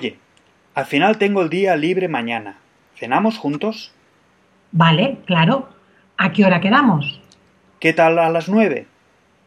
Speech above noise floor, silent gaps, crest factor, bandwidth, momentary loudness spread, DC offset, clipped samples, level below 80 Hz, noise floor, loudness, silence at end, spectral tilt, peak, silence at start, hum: 40 dB; none; 18 dB; 10.5 kHz; 13 LU; under 0.1%; under 0.1%; -64 dBFS; -57 dBFS; -17 LUFS; 0.65 s; -7 dB/octave; 0 dBFS; 0 s; none